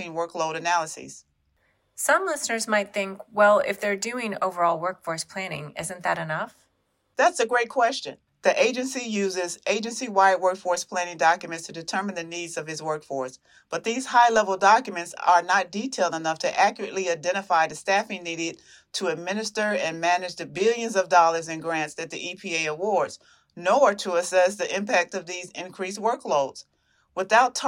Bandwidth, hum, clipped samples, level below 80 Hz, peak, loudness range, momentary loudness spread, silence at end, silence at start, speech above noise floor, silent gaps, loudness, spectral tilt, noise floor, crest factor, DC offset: 16 kHz; none; under 0.1%; -74 dBFS; -6 dBFS; 4 LU; 13 LU; 0 s; 0 s; 47 dB; none; -24 LUFS; -3 dB/octave; -71 dBFS; 20 dB; under 0.1%